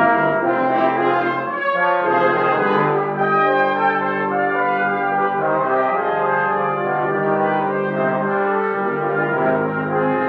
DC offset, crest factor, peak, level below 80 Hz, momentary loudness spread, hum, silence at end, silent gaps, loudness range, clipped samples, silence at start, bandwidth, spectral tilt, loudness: under 0.1%; 16 dB; -2 dBFS; -66 dBFS; 4 LU; none; 0 s; none; 2 LU; under 0.1%; 0 s; 5.8 kHz; -8.5 dB/octave; -18 LUFS